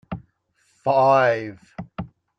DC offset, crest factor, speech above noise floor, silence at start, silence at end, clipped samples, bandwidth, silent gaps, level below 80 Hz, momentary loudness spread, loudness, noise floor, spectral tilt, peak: under 0.1%; 18 dB; 47 dB; 0.1 s; 0.35 s; under 0.1%; 7.8 kHz; none; -54 dBFS; 20 LU; -19 LUFS; -66 dBFS; -7 dB/octave; -6 dBFS